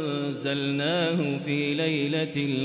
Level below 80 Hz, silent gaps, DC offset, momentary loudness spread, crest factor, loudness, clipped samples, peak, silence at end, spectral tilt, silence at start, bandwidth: -70 dBFS; none; under 0.1%; 4 LU; 12 dB; -26 LUFS; under 0.1%; -14 dBFS; 0 s; -4.5 dB/octave; 0 s; 4 kHz